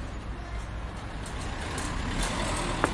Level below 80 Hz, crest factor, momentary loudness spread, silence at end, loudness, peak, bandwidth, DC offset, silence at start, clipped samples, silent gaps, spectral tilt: -36 dBFS; 26 dB; 9 LU; 0 s; -33 LUFS; -6 dBFS; 11.5 kHz; under 0.1%; 0 s; under 0.1%; none; -4 dB/octave